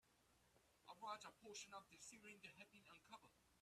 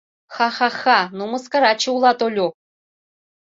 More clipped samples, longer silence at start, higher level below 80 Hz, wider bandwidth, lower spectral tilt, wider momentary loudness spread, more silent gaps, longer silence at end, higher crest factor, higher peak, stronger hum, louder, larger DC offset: neither; second, 0.05 s vs 0.3 s; second, -90 dBFS vs -70 dBFS; first, 13.5 kHz vs 7.8 kHz; second, -1.5 dB/octave vs -3 dB/octave; about the same, 11 LU vs 9 LU; neither; second, 0 s vs 0.9 s; about the same, 22 dB vs 18 dB; second, -40 dBFS vs -2 dBFS; neither; second, -60 LUFS vs -18 LUFS; neither